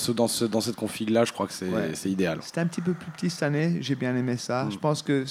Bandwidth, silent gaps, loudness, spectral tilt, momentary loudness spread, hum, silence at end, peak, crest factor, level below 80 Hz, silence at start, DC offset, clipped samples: 16 kHz; none; -27 LUFS; -5 dB/octave; 6 LU; none; 0 s; -8 dBFS; 18 dB; -66 dBFS; 0 s; under 0.1%; under 0.1%